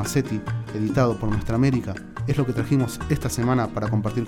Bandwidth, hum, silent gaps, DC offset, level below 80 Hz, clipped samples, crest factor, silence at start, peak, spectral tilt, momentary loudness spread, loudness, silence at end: 17 kHz; none; none; under 0.1%; -40 dBFS; under 0.1%; 14 dB; 0 s; -8 dBFS; -6.5 dB/octave; 6 LU; -24 LUFS; 0 s